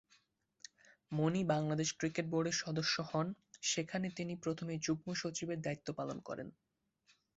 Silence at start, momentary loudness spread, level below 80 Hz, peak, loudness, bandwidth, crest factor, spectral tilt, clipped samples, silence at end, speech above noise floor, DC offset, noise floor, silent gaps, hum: 1.1 s; 12 LU; -74 dBFS; -22 dBFS; -38 LUFS; 8 kHz; 18 dB; -4.5 dB/octave; under 0.1%; 0.9 s; 37 dB; under 0.1%; -75 dBFS; none; none